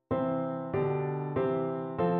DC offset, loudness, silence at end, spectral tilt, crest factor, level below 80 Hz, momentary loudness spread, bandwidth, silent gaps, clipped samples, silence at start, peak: under 0.1%; -31 LUFS; 0 s; -8 dB/octave; 14 dB; -60 dBFS; 3 LU; 4.3 kHz; none; under 0.1%; 0.1 s; -16 dBFS